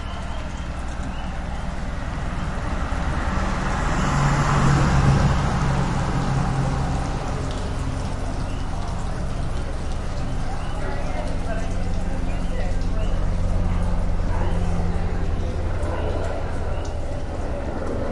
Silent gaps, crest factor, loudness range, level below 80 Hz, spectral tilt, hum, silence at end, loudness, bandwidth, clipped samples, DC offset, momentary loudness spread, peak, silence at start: none; 16 dB; 8 LU; -26 dBFS; -6.5 dB/octave; none; 0 s; -25 LUFS; 11.5 kHz; under 0.1%; under 0.1%; 10 LU; -6 dBFS; 0 s